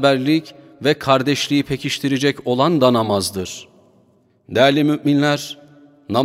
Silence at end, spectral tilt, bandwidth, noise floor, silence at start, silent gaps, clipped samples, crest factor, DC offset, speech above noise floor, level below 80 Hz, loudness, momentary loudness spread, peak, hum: 0 s; -5 dB/octave; 16 kHz; -57 dBFS; 0 s; none; under 0.1%; 18 dB; under 0.1%; 39 dB; -56 dBFS; -18 LUFS; 10 LU; 0 dBFS; none